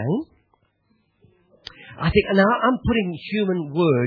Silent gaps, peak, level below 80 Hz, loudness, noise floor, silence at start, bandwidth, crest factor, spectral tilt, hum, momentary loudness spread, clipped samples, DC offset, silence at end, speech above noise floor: none; -4 dBFS; -42 dBFS; -21 LUFS; -66 dBFS; 0 s; 5.4 kHz; 18 dB; -9 dB/octave; none; 23 LU; under 0.1%; under 0.1%; 0 s; 46 dB